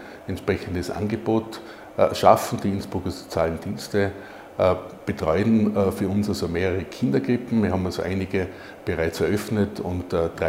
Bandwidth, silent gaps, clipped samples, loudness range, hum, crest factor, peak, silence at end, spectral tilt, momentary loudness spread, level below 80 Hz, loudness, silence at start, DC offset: 16 kHz; none; under 0.1%; 2 LU; none; 24 dB; 0 dBFS; 0 s; -6.5 dB/octave; 10 LU; -52 dBFS; -24 LUFS; 0 s; under 0.1%